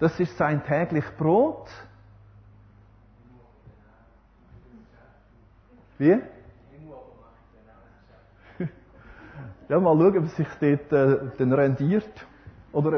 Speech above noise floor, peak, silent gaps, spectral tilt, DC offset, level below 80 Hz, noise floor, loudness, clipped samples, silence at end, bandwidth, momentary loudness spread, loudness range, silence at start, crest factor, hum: 34 dB; -8 dBFS; none; -9.5 dB/octave; under 0.1%; -56 dBFS; -56 dBFS; -23 LUFS; under 0.1%; 0 s; 6.4 kHz; 24 LU; 11 LU; 0 s; 18 dB; none